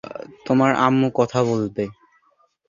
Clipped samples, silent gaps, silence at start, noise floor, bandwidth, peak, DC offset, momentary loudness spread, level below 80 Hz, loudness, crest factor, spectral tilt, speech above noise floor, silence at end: under 0.1%; none; 0.05 s; -63 dBFS; 7.4 kHz; -2 dBFS; under 0.1%; 15 LU; -58 dBFS; -20 LUFS; 20 dB; -7 dB/octave; 43 dB; 0.75 s